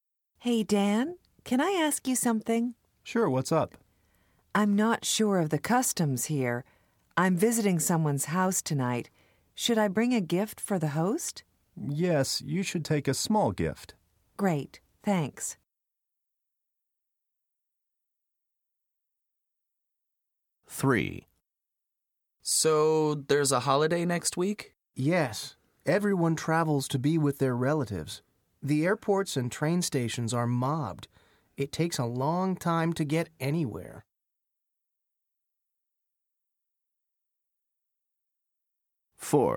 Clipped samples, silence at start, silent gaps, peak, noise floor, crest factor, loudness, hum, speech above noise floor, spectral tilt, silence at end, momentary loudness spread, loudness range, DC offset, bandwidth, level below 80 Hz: under 0.1%; 0.4 s; none; -10 dBFS; -87 dBFS; 20 dB; -28 LUFS; none; 60 dB; -5 dB/octave; 0 s; 11 LU; 8 LU; under 0.1%; 18.5 kHz; -64 dBFS